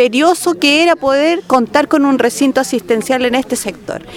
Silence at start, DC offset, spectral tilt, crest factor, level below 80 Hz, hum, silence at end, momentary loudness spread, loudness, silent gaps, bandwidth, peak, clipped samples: 0 s; under 0.1%; -3 dB/octave; 12 dB; -50 dBFS; none; 0 s; 7 LU; -13 LUFS; none; 17 kHz; 0 dBFS; under 0.1%